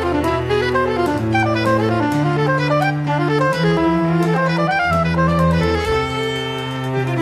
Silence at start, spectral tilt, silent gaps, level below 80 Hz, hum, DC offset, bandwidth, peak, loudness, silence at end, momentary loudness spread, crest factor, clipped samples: 0 s; -7 dB/octave; none; -36 dBFS; none; under 0.1%; 14 kHz; -4 dBFS; -17 LUFS; 0 s; 4 LU; 12 dB; under 0.1%